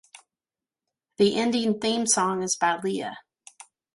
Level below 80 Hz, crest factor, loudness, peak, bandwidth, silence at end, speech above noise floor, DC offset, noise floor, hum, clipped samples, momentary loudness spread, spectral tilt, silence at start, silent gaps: -68 dBFS; 20 dB; -24 LUFS; -8 dBFS; 11.5 kHz; 0.75 s; over 66 dB; under 0.1%; under -90 dBFS; none; under 0.1%; 10 LU; -3 dB/octave; 1.2 s; none